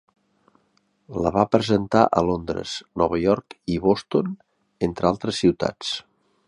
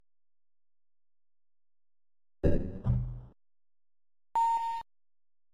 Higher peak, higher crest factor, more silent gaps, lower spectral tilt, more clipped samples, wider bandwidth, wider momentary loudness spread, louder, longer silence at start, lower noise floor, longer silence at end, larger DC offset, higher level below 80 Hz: first, -2 dBFS vs -12 dBFS; about the same, 22 dB vs 24 dB; neither; second, -6 dB/octave vs -8.5 dB/octave; neither; first, 11 kHz vs 9.4 kHz; about the same, 10 LU vs 12 LU; first, -23 LUFS vs -33 LUFS; first, 1.1 s vs 0 s; second, -66 dBFS vs under -90 dBFS; first, 0.5 s vs 0 s; neither; second, -48 dBFS vs -42 dBFS